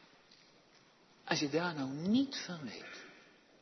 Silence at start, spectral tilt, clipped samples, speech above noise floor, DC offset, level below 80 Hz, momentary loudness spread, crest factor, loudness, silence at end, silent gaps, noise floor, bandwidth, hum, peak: 1.25 s; -4 dB/octave; under 0.1%; 29 dB; under 0.1%; -82 dBFS; 18 LU; 22 dB; -36 LUFS; 0.4 s; none; -65 dBFS; 6.2 kHz; none; -16 dBFS